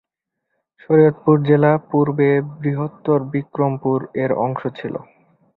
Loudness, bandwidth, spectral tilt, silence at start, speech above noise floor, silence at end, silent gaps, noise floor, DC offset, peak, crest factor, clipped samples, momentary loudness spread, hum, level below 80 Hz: -18 LUFS; 4.2 kHz; -12 dB/octave; 0.9 s; 61 dB; 0.55 s; none; -79 dBFS; under 0.1%; -2 dBFS; 16 dB; under 0.1%; 11 LU; none; -58 dBFS